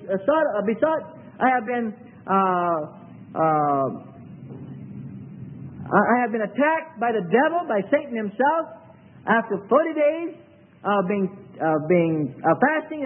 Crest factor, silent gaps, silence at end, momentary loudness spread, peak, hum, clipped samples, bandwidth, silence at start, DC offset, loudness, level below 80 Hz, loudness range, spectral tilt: 20 dB; none; 0 s; 18 LU; -4 dBFS; none; under 0.1%; 3.6 kHz; 0 s; under 0.1%; -22 LUFS; -68 dBFS; 3 LU; -11.5 dB/octave